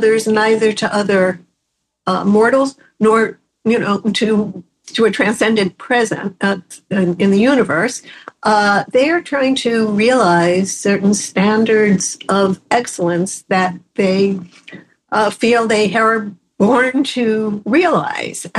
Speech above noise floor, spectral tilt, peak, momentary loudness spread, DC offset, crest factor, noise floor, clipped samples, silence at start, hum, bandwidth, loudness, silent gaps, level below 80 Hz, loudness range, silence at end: 58 dB; -5 dB/octave; -2 dBFS; 8 LU; under 0.1%; 14 dB; -73 dBFS; under 0.1%; 0 s; none; 12.5 kHz; -15 LUFS; none; -56 dBFS; 3 LU; 0 s